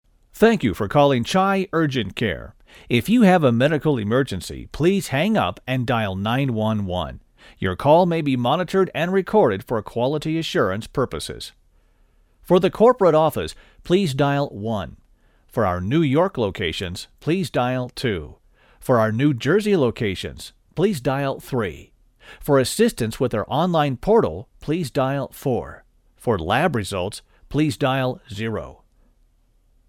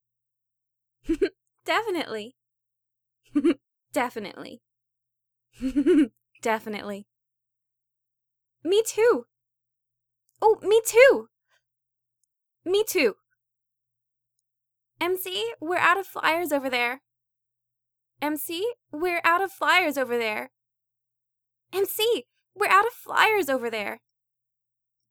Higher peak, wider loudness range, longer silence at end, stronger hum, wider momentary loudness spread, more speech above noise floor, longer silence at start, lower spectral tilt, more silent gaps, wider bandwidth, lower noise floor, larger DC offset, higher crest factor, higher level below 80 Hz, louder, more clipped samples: about the same, -4 dBFS vs -2 dBFS; second, 4 LU vs 7 LU; about the same, 1.15 s vs 1.15 s; neither; about the same, 13 LU vs 14 LU; second, 39 dB vs 60 dB; second, 0.35 s vs 1.05 s; first, -6 dB/octave vs -2.5 dB/octave; neither; second, 17.5 kHz vs over 20 kHz; second, -59 dBFS vs -84 dBFS; neither; second, 18 dB vs 24 dB; first, -46 dBFS vs -60 dBFS; first, -21 LUFS vs -24 LUFS; neither